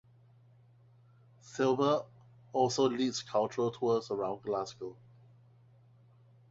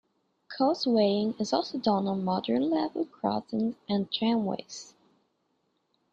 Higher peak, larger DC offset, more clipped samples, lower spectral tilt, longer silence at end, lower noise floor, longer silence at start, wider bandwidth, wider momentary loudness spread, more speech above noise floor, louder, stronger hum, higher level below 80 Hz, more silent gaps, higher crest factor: second, -16 dBFS vs -12 dBFS; neither; neither; about the same, -5 dB/octave vs -6 dB/octave; first, 1.6 s vs 1.25 s; second, -62 dBFS vs -75 dBFS; first, 1.45 s vs 0.5 s; about the same, 8 kHz vs 7.8 kHz; first, 15 LU vs 8 LU; second, 30 dB vs 47 dB; second, -32 LUFS vs -28 LUFS; neither; about the same, -74 dBFS vs -70 dBFS; neither; about the same, 20 dB vs 18 dB